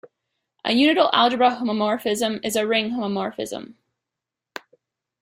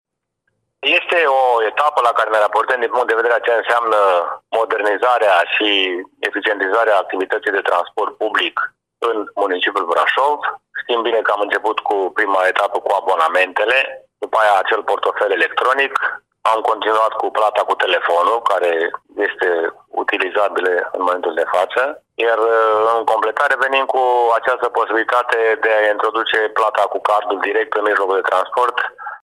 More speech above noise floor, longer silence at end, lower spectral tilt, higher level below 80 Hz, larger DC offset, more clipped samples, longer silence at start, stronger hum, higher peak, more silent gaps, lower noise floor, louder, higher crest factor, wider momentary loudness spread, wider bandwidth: first, 65 dB vs 55 dB; first, 1.5 s vs 0.1 s; first, -3.5 dB/octave vs -2 dB/octave; first, -66 dBFS vs -72 dBFS; neither; neither; second, 0.65 s vs 0.8 s; neither; about the same, -2 dBFS vs -2 dBFS; neither; first, -86 dBFS vs -72 dBFS; second, -21 LUFS vs -16 LUFS; first, 22 dB vs 16 dB; first, 20 LU vs 7 LU; first, 16 kHz vs 14.5 kHz